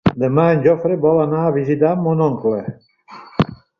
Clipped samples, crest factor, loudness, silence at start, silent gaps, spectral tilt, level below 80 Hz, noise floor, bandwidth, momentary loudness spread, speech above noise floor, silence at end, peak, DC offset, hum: under 0.1%; 16 dB; -17 LUFS; 0.05 s; none; -9.5 dB/octave; -48 dBFS; -40 dBFS; 6.6 kHz; 7 LU; 25 dB; 0.25 s; -2 dBFS; under 0.1%; none